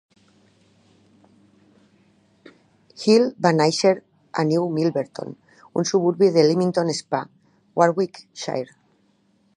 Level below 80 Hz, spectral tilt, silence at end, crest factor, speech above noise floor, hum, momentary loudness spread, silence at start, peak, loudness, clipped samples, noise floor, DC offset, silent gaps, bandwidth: -72 dBFS; -5.5 dB/octave; 0.9 s; 22 dB; 43 dB; none; 14 LU; 3 s; -2 dBFS; -21 LUFS; under 0.1%; -63 dBFS; under 0.1%; none; 11 kHz